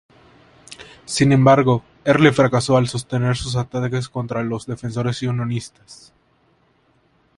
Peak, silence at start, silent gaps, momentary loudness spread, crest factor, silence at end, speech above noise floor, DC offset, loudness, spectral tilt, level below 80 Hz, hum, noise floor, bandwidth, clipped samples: 0 dBFS; 0.7 s; none; 13 LU; 20 dB; 1.45 s; 42 dB; under 0.1%; -19 LUFS; -6 dB/octave; -48 dBFS; none; -60 dBFS; 11.5 kHz; under 0.1%